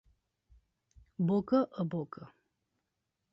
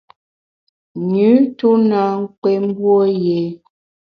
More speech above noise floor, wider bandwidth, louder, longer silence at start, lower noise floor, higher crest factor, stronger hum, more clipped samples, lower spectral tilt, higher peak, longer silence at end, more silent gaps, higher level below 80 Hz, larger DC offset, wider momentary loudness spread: second, 53 dB vs over 75 dB; first, 6 kHz vs 5.4 kHz; second, -32 LUFS vs -15 LUFS; first, 1.2 s vs 0.95 s; second, -85 dBFS vs under -90 dBFS; about the same, 20 dB vs 16 dB; neither; neither; about the same, -10.5 dB/octave vs -10 dB/octave; second, -16 dBFS vs 0 dBFS; first, 1.05 s vs 0.5 s; second, none vs 2.38-2.42 s; about the same, -68 dBFS vs -64 dBFS; neither; first, 20 LU vs 9 LU